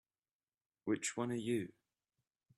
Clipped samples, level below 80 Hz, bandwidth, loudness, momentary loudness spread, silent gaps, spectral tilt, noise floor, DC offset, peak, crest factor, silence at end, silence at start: under 0.1%; -82 dBFS; 13 kHz; -40 LUFS; 9 LU; none; -4.5 dB/octave; under -90 dBFS; under 0.1%; -24 dBFS; 20 dB; 0.9 s; 0.85 s